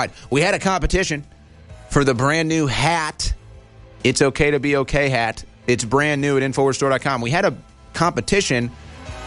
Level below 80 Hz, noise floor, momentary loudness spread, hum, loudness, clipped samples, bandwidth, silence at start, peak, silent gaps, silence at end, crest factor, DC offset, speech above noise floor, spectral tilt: -34 dBFS; -43 dBFS; 9 LU; none; -19 LUFS; under 0.1%; 11.5 kHz; 0 s; -2 dBFS; none; 0 s; 18 dB; under 0.1%; 24 dB; -4.5 dB/octave